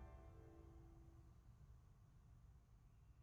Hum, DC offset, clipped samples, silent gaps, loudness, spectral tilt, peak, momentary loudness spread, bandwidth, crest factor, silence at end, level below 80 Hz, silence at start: none; under 0.1%; under 0.1%; none; -66 LUFS; -8 dB/octave; -50 dBFS; 5 LU; 7.2 kHz; 14 dB; 0 s; -66 dBFS; 0 s